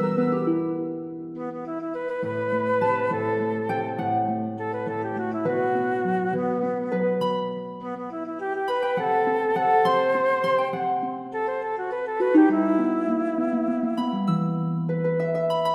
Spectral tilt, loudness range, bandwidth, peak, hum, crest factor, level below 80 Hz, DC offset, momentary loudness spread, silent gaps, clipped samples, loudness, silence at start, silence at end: -8 dB/octave; 3 LU; 11 kHz; -8 dBFS; none; 16 dB; -70 dBFS; under 0.1%; 10 LU; none; under 0.1%; -25 LUFS; 0 s; 0 s